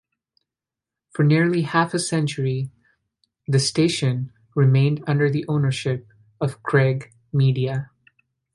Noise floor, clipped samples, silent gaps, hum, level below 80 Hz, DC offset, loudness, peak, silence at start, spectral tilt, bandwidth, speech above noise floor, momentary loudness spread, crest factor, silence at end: -88 dBFS; under 0.1%; none; none; -60 dBFS; under 0.1%; -21 LUFS; -4 dBFS; 1.15 s; -6 dB/octave; 11.5 kHz; 68 dB; 11 LU; 18 dB; 0.7 s